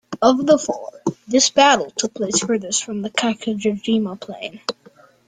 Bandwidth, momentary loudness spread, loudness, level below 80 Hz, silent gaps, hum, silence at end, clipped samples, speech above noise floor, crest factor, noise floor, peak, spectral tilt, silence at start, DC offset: 10 kHz; 14 LU; -19 LUFS; -60 dBFS; none; none; 0.55 s; under 0.1%; 31 dB; 18 dB; -50 dBFS; -2 dBFS; -3 dB/octave; 0.1 s; under 0.1%